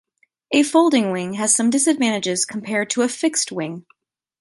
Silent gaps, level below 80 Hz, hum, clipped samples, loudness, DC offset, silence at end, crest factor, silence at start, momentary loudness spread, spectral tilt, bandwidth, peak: none; -70 dBFS; none; under 0.1%; -19 LUFS; under 0.1%; 0.6 s; 18 dB; 0.5 s; 8 LU; -3 dB/octave; 11.5 kHz; -4 dBFS